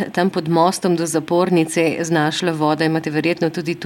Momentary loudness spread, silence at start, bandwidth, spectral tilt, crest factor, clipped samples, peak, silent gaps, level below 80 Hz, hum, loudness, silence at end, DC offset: 3 LU; 0 s; 17 kHz; -5 dB/octave; 16 dB; under 0.1%; -2 dBFS; none; -64 dBFS; none; -18 LUFS; 0 s; under 0.1%